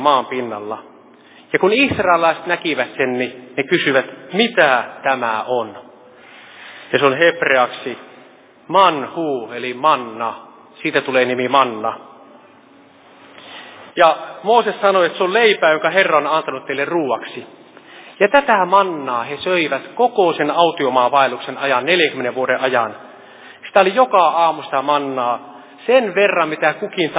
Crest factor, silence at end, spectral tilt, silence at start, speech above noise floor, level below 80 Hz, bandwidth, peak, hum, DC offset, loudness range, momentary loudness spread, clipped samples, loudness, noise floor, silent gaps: 18 dB; 0 s; -8 dB/octave; 0 s; 30 dB; -60 dBFS; 4 kHz; 0 dBFS; none; under 0.1%; 4 LU; 13 LU; under 0.1%; -16 LUFS; -47 dBFS; none